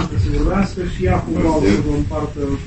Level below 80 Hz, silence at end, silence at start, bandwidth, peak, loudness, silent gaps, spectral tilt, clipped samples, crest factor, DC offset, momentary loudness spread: -24 dBFS; 0 s; 0 s; 8.6 kHz; -2 dBFS; -18 LUFS; none; -7.5 dB/octave; under 0.1%; 16 dB; 0.8%; 6 LU